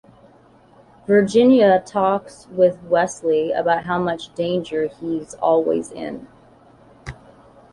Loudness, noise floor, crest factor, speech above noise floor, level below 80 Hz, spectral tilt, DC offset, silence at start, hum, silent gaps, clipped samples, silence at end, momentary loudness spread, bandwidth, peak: -19 LUFS; -51 dBFS; 16 dB; 32 dB; -54 dBFS; -6 dB/octave; under 0.1%; 1.1 s; none; none; under 0.1%; 0.6 s; 19 LU; 11.5 kHz; -4 dBFS